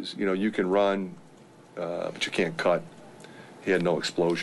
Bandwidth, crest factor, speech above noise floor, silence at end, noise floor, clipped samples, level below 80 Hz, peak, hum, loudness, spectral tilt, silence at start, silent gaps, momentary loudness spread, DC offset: 11.5 kHz; 16 dB; 25 dB; 0 s; -52 dBFS; under 0.1%; -68 dBFS; -12 dBFS; none; -27 LUFS; -5 dB/octave; 0 s; none; 22 LU; under 0.1%